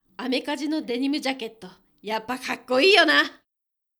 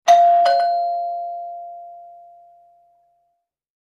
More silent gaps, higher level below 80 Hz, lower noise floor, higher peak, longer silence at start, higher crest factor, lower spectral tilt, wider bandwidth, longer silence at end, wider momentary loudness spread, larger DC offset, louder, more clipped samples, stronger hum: neither; first, -72 dBFS vs -80 dBFS; first, -83 dBFS vs -72 dBFS; about the same, -4 dBFS vs -2 dBFS; first, 0.2 s vs 0.05 s; about the same, 20 dB vs 18 dB; first, -2.5 dB/octave vs 0 dB/octave; first, over 20 kHz vs 13.5 kHz; second, 0.65 s vs 1.75 s; second, 15 LU vs 24 LU; neither; second, -22 LUFS vs -17 LUFS; neither; neither